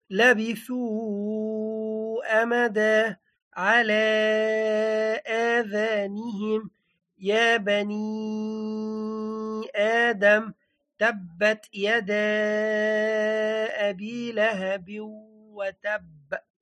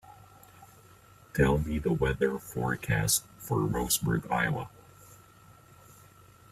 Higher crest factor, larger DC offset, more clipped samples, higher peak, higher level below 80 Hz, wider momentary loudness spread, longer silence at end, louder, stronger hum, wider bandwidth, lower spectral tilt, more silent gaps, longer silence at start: about the same, 18 dB vs 20 dB; neither; neither; first, -6 dBFS vs -12 dBFS; second, -76 dBFS vs -46 dBFS; first, 11 LU vs 7 LU; second, 0.2 s vs 1.85 s; first, -25 LUFS vs -29 LUFS; neither; second, 11.5 kHz vs 16 kHz; about the same, -4.5 dB/octave vs -4.5 dB/octave; first, 3.42-3.51 s vs none; about the same, 0.1 s vs 0.1 s